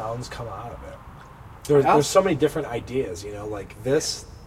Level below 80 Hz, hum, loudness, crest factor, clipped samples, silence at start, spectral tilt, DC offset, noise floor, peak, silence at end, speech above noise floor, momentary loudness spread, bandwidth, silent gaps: -46 dBFS; none; -23 LUFS; 20 dB; under 0.1%; 0 s; -5 dB/octave; under 0.1%; -43 dBFS; -4 dBFS; 0 s; 20 dB; 23 LU; 16 kHz; none